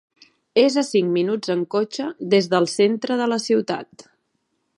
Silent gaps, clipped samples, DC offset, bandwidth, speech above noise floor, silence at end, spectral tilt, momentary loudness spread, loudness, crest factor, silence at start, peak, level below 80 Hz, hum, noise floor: none; under 0.1%; under 0.1%; 11.5 kHz; 52 dB; 0.95 s; -5 dB/octave; 7 LU; -21 LUFS; 18 dB; 0.55 s; -4 dBFS; -74 dBFS; none; -72 dBFS